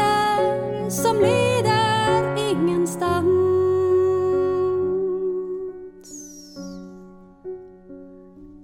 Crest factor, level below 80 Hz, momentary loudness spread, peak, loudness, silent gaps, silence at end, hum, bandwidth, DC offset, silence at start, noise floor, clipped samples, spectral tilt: 14 dB; -54 dBFS; 20 LU; -8 dBFS; -21 LUFS; none; 0 s; none; 16 kHz; under 0.1%; 0 s; -44 dBFS; under 0.1%; -5.5 dB/octave